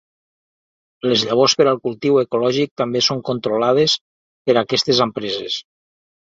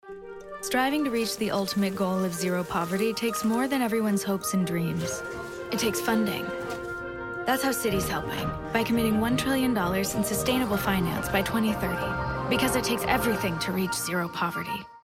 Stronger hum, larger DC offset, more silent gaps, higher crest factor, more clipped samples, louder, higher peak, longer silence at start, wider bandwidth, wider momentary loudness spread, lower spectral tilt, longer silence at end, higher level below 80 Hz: neither; neither; first, 2.71-2.76 s, 4.01-4.45 s vs none; about the same, 18 dB vs 16 dB; neither; first, -18 LUFS vs -27 LUFS; first, -2 dBFS vs -12 dBFS; first, 1.05 s vs 0.05 s; second, 7.8 kHz vs 16.5 kHz; about the same, 9 LU vs 8 LU; about the same, -4 dB/octave vs -4.5 dB/octave; first, 0.8 s vs 0.05 s; second, -60 dBFS vs -48 dBFS